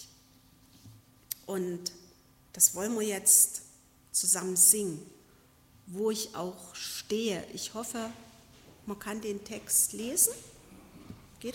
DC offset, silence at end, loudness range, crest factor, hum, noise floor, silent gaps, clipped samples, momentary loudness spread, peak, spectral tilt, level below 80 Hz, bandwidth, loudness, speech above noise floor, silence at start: under 0.1%; 0 s; 11 LU; 24 dB; none; -61 dBFS; none; under 0.1%; 20 LU; -8 dBFS; -2 dB/octave; -68 dBFS; 16.5 kHz; -27 LUFS; 31 dB; 0 s